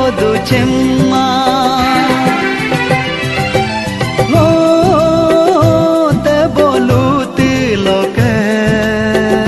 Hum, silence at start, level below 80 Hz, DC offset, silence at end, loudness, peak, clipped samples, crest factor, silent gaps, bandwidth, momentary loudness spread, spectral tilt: none; 0 s; -34 dBFS; under 0.1%; 0 s; -11 LUFS; 0 dBFS; under 0.1%; 10 dB; none; 12.5 kHz; 4 LU; -6 dB/octave